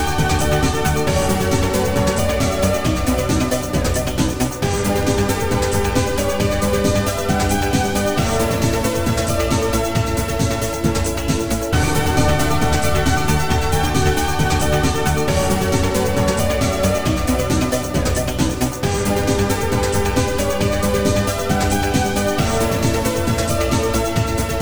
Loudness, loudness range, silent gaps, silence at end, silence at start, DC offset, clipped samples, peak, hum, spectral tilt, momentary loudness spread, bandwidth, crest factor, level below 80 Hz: -18 LUFS; 1 LU; none; 0 s; 0 s; 2%; under 0.1%; -2 dBFS; none; -5 dB/octave; 2 LU; over 20 kHz; 16 dB; -28 dBFS